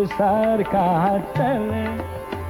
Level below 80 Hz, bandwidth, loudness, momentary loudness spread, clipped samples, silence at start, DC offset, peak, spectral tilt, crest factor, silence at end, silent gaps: -44 dBFS; 18.5 kHz; -21 LUFS; 9 LU; under 0.1%; 0 s; under 0.1%; -8 dBFS; -8 dB/octave; 14 dB; 0 s; none